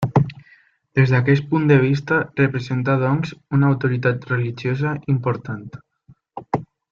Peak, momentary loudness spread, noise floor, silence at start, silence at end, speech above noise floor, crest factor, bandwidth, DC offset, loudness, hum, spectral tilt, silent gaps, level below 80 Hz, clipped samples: -4 dBFS; 11 LU; -54 dBFS; 0 s; 0.25 s; 36 dB; 16 dB; 6.8 kHz; under 0.1%; -20 LUFS; none; -8.5 dB/octave; none; -54 dBFS; under 0.1%